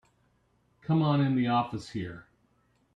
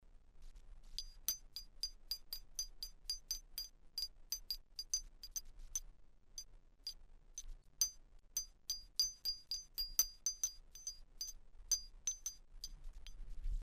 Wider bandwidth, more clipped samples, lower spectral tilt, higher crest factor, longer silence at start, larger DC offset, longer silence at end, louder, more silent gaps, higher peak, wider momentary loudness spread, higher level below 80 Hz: second, 9.2 kHz vs 15.5 kHz; neither; first, -8 dB/octave vs 1.5 dB/octave; second, 16 dB vs 28 dB; first, 0.9 s vs 0 s; neither; first, 0.75 s vs 0 s; first, -28 LUFS vs -43 LUFS; neither; first, -14 dBFS vs -18 dBFS; about the same, 17 LU vs 15 LU; second, -66 dBFS vs -54 dBFS